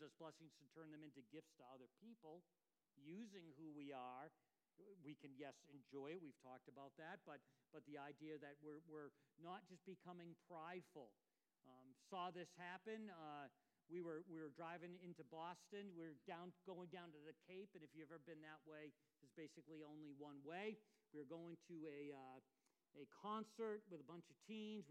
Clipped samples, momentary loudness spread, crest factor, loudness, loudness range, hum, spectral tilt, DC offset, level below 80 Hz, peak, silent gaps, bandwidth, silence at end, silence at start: under 0.1%; 12 LU; 20 dB; -59 LUFS; 5 LU; none; -6 dB/octave; under 0.1%; under -90 dBFS; -40 dBFS; none; 10 kHz; 0 s; 0 s